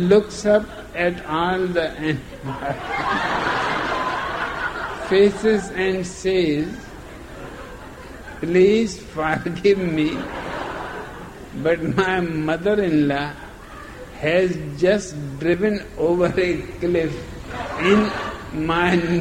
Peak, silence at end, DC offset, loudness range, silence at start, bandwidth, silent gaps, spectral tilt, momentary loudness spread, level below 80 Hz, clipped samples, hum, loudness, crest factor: -4 dBFS; 0 s; under 0.1%; 2 LU; 0 s; 15.5 kHz; none; -6 dB/octave; 18 LU; -42 dBFS; under 0.1%; none; -21 LUFS; 18 dB